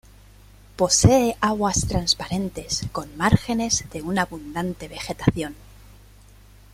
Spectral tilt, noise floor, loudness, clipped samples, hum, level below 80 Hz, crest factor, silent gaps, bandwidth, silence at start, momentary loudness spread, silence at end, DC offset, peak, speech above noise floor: -4 dB/octave; -49 dBFS; -22 LUFS; under 0.1%; 50 Hz at -45 dBFS; -40 dBFS; 22 dB; none; 16 kHz; 0.8 s; 13 LU; 1.2 s; under 0.1%; -2 dBFS; 26 dB